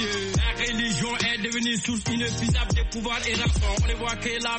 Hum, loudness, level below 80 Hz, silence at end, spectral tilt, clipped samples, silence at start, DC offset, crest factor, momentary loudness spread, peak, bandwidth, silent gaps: none; -25 LUFS; -30 dBFS; 0 s; -3.5 dB/octave; under 0.1%; 0 s; under 0.1%; 14 dB; 3 LU; -12 dBFS; 8.8 kHz; none